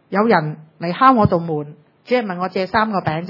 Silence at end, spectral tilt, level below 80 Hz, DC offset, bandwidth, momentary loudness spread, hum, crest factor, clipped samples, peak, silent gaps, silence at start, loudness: 0 s; -9 dB/octave; -50 dBFS; under 0.1%; 5.8 kHz; 14 LU; none; 18 dB; under 0.1%; 0 dBFS; none; 0.1 s; -18 LUFS